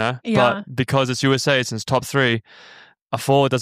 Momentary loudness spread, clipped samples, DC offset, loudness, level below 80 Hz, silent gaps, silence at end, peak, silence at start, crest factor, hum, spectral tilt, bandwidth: 7 LU; under 0.1%; under 0.1%; -19 LUFS; -56 dBFS; 3.02-3.06 s; 0 s; -2 dBFS; 0 s; 18 dB; none; -5 dB/octave; 15.5 kHz